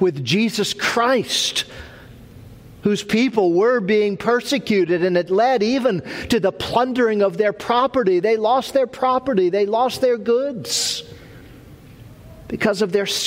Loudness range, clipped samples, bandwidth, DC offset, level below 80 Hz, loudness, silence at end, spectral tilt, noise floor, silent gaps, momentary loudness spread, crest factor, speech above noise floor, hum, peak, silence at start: 3 LU; under 0.1%; 16 kHz; under 0.1%; -52 dBFS; -19 LUFS; 0 s; -4 dB/octave; -42 dBFS; none; 5 LU; 16 dB; 24 dB; none; -4 dBFS; 0 s